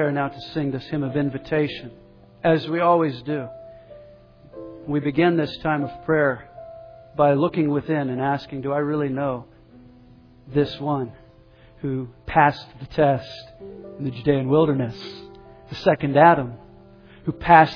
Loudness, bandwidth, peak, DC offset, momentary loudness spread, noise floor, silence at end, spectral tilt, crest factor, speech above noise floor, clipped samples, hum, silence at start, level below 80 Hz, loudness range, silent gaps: -22 LUFS; 5.4 kHz; 0 dBFS; under 0.1%; 20 LU; -50 dBFS; 0 s; -8.5 dB/octave; 22 dB; 29 dB; under 0.1%; none; 0 s; -50 dBFS; 5 LU; none